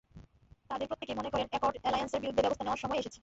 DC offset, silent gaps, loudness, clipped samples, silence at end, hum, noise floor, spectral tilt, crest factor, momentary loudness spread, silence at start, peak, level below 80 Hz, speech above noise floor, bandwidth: under 0.1%; none; -34 LUFS; under 0.1%; 0.05 s; none; -60 dBFS; -3 dB/octave; 18 dB; 7 LU; 0.15 s; -16 dBFS; -58 dBFS; 26 dB; 8 kHz